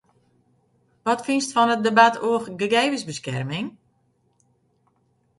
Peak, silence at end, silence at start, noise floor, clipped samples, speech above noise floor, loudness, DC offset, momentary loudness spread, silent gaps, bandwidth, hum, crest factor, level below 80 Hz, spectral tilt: 0 dBFS; 1.7 s; 1.05 s; -66 dBFS; under 0.1%; 45 dB; -21 LUFS; under 0.1%; 13 LU; none; 11.5 kHz; none; 24 dB; -68 dBFS; -4 dB/octave